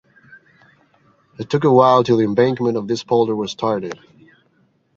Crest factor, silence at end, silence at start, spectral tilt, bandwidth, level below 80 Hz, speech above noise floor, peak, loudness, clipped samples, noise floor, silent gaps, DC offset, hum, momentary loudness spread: 18 dB; 1 s; 1.4 s; -7 dB/octave; 7.6 kHz; -60 dBFS; 44 dB; -2 dBFS; -17 LUFS; under 0.1%; -60 dBFS; none; under 0.1%; none; 14 LU